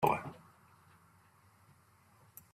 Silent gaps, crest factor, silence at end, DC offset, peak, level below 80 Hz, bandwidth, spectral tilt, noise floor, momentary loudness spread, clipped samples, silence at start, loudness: none; 28 dB; 2.15 s; under 0.1%; -14 dBFS; -72 dBFS; 15.5 kHz; -6 dB/octave; -66 dBFS; 27 LU; under 0.1%; 0 s; -37 LUFS